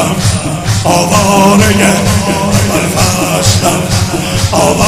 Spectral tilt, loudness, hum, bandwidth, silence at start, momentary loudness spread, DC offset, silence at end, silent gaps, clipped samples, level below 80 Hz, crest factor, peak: -4.5 dB/octave; -9 LUFS; none; 16 kHz; 0 s; 6 LU; under 0.1%; 0 s; none; 0.5%; -28 dBFS; 10 dB; 0 dBFS